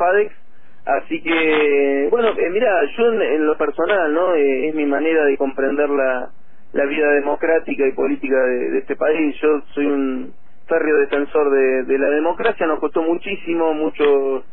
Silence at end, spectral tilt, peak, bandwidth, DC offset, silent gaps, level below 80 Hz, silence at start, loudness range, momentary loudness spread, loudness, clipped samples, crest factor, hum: 0.1 s; -8.5 dB/octave; -4 dBFS; 4 kHz; 4%; none; -52 dBFS; 0 s; 2 LU; 6 LU; -18 LUFS; under 0.1%; 14 dB; none